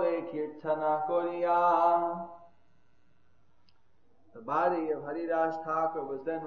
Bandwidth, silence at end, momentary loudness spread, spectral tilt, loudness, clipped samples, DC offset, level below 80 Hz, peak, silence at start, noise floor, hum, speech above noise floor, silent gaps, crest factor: 6.6 kHz; 0 s; 11 LU; -7.5 dB/octave; -30 LUFS; under 0.1%; 0.1%; -76 dBFS; -14 dBFS; 0 s; -71 dBFS; none; 41 dB; none; 18 dB